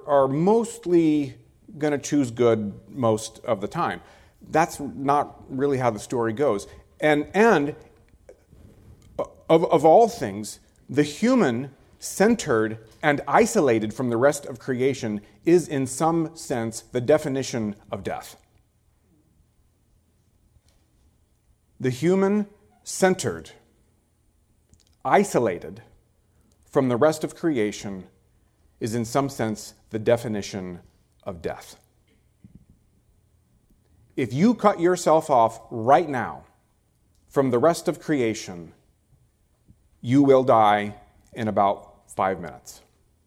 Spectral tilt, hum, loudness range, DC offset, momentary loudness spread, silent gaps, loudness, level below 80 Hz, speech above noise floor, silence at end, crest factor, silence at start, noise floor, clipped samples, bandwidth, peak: -5.5 dB/octave; none; 7 LU; under 0.1%; 16 LU; none; -23 LUFS; -58 dBFS; 42 dB; 0.55 s; 22 dB; 0.05 s; -65 dBFS; under 0.1%; 16.5 kHz; -2 dBFS